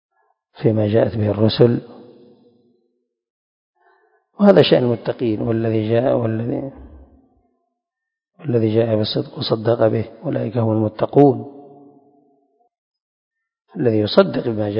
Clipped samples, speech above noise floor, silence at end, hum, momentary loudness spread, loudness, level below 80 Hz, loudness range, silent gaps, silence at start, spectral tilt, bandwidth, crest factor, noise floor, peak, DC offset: under 0.1%; 67 dB; 0 s; none; 11 LU; -18 LUFS; -52 dBFS; 5 LU; 3.30-3.73 s, 12.78-12.91 s, 13.02-13.31 s; 0.6 s; -10 dB/octave; 5.4 kHz; 20 dB; -84 dBFS; 0 dBFS; under 0.1%